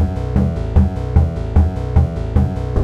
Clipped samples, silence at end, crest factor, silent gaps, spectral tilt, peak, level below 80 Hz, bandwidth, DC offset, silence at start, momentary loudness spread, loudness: under 0.1%; 0 s; 14 dB; none; -9.5 dB/octave; -2 dBFS; -20 dBFS; 5.6 kHz; under 0.1%; 0 s; 2 LU; -17 LUFS